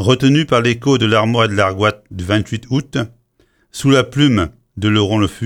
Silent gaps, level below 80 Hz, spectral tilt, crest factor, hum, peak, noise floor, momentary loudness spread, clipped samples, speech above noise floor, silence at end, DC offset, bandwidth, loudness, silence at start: none; -44 dBFS; -6 dB/octave; 14 dB; none; 0 dBFS; -58 dBFS; 10 LU; under 0.1%; 43 dB; 0 s; under 0.1%; 15 kHz; -15 LUFS; 0 s